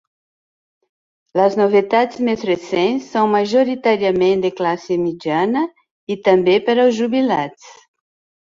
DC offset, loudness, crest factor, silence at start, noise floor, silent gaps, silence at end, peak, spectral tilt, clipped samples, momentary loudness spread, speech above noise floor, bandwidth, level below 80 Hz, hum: under 0.1%; -17 LUFS; 16 dB; 1.35 s; under -90 dBFS; 5.91-6.07 s; 0.75 s; -2 dBFS; -6 dB/octave; under 0.1%; 7 LU; over 74 dB; 7.6 kHz; -60 dBFS; none